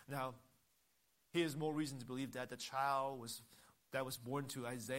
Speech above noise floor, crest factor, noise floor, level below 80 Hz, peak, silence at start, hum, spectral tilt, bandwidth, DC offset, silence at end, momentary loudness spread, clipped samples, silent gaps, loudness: 36 dB; 20 dB; -79 dBFS; -82 dBFS; -24 dBFS; 0 s; none; -4.5 dB/octave; 16 kHz; under 0.1%; 0 s; 9 LU; under 0.1%; none; -43 LUFS